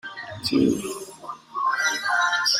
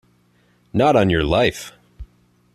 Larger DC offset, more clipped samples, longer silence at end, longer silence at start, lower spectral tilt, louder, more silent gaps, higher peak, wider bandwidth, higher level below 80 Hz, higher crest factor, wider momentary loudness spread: neither; neither; second, 0 s vs 0.5 s; second, 0.05 s vs 0.75 s; second, -2.5 dB/octave vs -6 dB/octave; second, -23 LUFS vs -18 LUFS; neither; second, -8 dBFS vs -4 dBFS; first, 16 kHz vs 14 kHz; second, -60 dBFS vs -40 dBFS; about the same, 16 dB vs 18 dB; second, 14 LU vs 18 LU